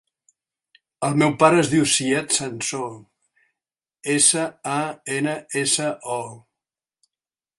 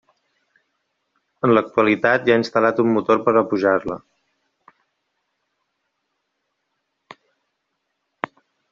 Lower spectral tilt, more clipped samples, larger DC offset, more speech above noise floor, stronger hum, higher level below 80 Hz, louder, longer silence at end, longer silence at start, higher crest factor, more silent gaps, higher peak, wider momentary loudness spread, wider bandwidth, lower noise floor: second, -3 dB/octave vs -4.5 dB/octave; neither; neither; first, over 69 dB vs 58 dB; neither; about the same, -64 dBFS vs -62 dBFS; about the same, -20 LUFS vs -18 LUFS; second, 1.2 s vs 4.75 s; second, 1 s vs 1.45 s; about the same, 22 dB vs 20 dB; neither; about the same, -2 dBFS vs -2 dBFS; second, 13 LU vs 16 LU; first, 11.5 kHz vs 7.4 kHz; first, under -90 dBFS vs -75 dBFS